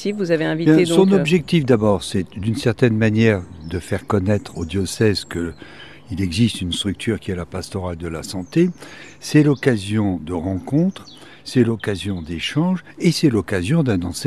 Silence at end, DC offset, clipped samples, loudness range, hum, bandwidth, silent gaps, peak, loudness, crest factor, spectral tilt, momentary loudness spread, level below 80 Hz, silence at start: 0 s; 0.4%; under 0.1%; 6 LU; none; 14 kHz; none; 0 dBFS; -19 LUFS; 18 dB; -6 dB/octave; 12 LU; -44 dBFS; 0 s